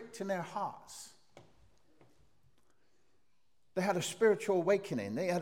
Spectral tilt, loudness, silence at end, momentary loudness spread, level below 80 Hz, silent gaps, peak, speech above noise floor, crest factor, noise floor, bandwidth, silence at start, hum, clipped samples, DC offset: -5 dB/octave; -34 LUFS; 0 s; 19 LU; -80 dBFS; none; -16 dBFS; 47 dB; 20 dB; -80 dBFS; 16.5 kHz; 0 s; none; under 0.1%; under 0.1%